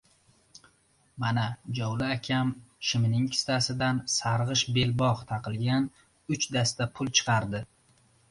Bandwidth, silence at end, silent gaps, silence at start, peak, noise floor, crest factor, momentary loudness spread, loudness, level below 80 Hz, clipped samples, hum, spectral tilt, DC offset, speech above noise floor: 11.5 kHz; 0.65 s; none; 1.15 s; -8 dBFS; -66 dBFS; 20 dB; 8 LU; -28 LUFS; -56 dBFS; under 0.1%; none; -4 dB/octave; under 0.1%; 38 dB